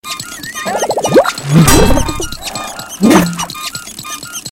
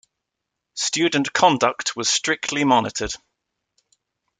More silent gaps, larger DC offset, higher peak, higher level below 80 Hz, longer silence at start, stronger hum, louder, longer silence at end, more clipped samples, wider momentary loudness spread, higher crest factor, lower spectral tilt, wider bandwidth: neither; neither; about the same, 0 dBFS vs -2 dBFS; first, -24 dBFS vs -52 dBFS; second, 0.05 s vs 0.75 s; neither; first, -13 LUFS vs -20 LUFS; second, 0 s vs 1.25 s; first, 1% vs under 0.1%; first, 15 LU vs 11 LU; second, 12 dB vs 22 dB; first, -4.5 dB/octave vs -2.5 dB/octave; first, over 20 kHz vs 9.6 kHz